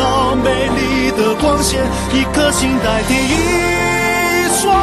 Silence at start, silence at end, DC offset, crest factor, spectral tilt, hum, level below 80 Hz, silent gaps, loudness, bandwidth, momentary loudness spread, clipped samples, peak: 0 s; 0 s; under 0.1%; 12 dB; -4 dB/octave; none; -28 dBFS; none; -14 LUFS; 13 kHz; 2 LU; under 0.1%; -2 dBFS